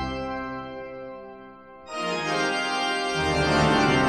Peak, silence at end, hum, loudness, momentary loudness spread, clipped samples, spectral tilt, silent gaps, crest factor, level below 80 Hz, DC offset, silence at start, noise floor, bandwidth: -8 dBFS; 0 s; none; -25 LUFS; 22 LU; under 0.1%; -4.5 dB/octave; none; 16 dB; -44 dBFS; under 0.1%; 0 s; -45 dBFS; 13 kHz